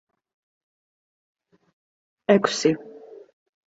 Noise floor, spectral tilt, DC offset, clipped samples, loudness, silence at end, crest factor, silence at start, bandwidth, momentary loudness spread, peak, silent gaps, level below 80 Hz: under -90 dBFS; -4.5 dB/octave; under 0.1%; under 0.1%; -22 LUFS; 0.55 s; 26 dB; 2.3 s; 8 kHz; 14 LU; -2 dBFS; none; -70 dBFS